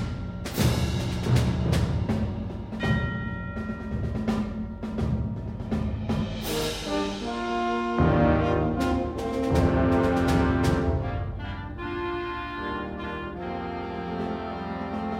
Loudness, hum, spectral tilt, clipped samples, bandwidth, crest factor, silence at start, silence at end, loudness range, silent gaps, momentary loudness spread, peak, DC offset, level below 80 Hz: -27 LUFS; none; -6.5 dB/octave; under 0.1%; 16 kHz; 18 dB; 0 s; 0 s; 8 LU; none; 10 LU; -10 dBFS; under 0.1%; -36 dBFS